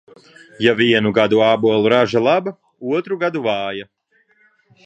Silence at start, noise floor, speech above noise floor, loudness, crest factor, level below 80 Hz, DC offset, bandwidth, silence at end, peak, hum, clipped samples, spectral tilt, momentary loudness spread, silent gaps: 0.6 s; -59 dBFS; 42 dB; -16 LUFS; 18 dB; -60 dBFS; under 0.1%; 8.4 kHz; 1.05 s; 0 dBFS; none; under 0.1%; -6 dB/octave; 11 LU; none